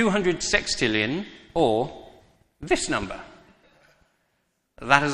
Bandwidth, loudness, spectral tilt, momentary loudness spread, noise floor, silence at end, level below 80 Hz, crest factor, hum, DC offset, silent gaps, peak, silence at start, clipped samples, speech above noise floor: 11.5 kHz; -24 LUFS; -3.5 dB/octave; 17 LU; -73 dBFS; 0 s; -46 dBFS; 26 dB; none; under 0.1%; none; 0 dBFS; 0 s; under 0.1%; 49 dB